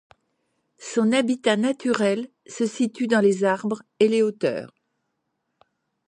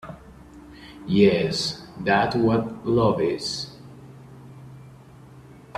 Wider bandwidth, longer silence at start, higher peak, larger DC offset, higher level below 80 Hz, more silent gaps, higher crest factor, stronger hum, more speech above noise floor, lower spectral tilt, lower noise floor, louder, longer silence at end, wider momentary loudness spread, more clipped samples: second, 10.5 kHz vs 13 kHz; first, 0.8 s vs 0.05 s; about the same, -6 dBFS vs -4 dBFS; neither; second, -74 dBFS vs -52 dBFS; neither; about the same, 18 dB vs 20 dB; neither; first, 55 dB vs 25 dB; about the same, -5 dB/octave vs -5.5 dB/octave; first, -77 dBFS vs -46 dBFS; about the same, -22 LUFS vs -22 LUFS; first, 1.4 s vs 0 s; second, 10 LU vs 26 LU; neither